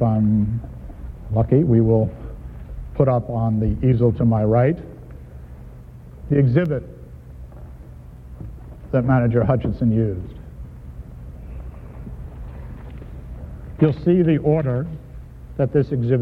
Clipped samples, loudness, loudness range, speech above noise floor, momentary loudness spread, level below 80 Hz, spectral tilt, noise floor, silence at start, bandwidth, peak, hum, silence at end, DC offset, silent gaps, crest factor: under 0.1%; -19 LUFS; 8 LU; 22 dB; 23 LU; -36 dBFS; -11.5 dB/octave; -39 dBFS; 0 s; 4.4 kHz; -4 dBFS; none; 0 s; under 0.1%; none; 18 dB